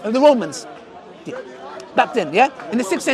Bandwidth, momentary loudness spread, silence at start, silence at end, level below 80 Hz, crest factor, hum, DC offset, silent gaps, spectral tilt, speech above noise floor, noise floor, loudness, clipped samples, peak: 13.5 kHz; 21 LU; 0 s; 0 s; -66 dBFS; 20 dB; none; under 0.1%; none; -4 dB/octave; 22 dB; -39 dBFS; -18 LUFS; under 0.1%; 0 dBFS